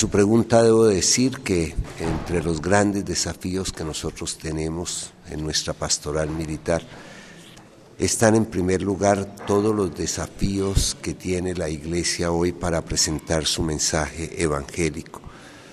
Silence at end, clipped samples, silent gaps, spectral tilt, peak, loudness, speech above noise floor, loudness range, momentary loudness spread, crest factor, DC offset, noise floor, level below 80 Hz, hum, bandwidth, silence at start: 0 s; under 0.1%; none; -4 dB/octave; -2 dBFS; -22 LUFS; 24 dB; 5 LU; 11 LU; 20 dB; under 0.1%; -47 dBFS; -38 dBFS; none; 13.5 kHz; 0 s